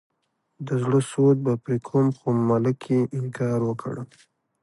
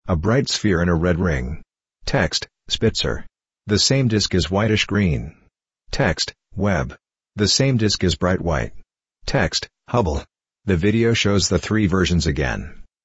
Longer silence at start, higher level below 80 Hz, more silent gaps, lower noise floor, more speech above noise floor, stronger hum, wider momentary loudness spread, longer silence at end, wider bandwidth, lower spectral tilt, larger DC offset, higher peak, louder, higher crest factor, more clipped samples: first, 0.6 s vs 0.05 s; second, -64 dBFS vs -34 dBFS; neither; first, -74 dBFS vs -50 dBFS; first, 52 dB vs 31 dB; neither; about the same, 12 LU vs 14 LU; first, 0.6 s vs 0.2 s; first, 11.5 kHz vs 8.2 kHz; first, -8.5 dB/octave vs -4.5 dB/octave; neither; second, -8 dBFS vs -4 dBFS; second, -23 LUFS vs -20 LUFS; about the same, 16 dB vs 18 dB; neither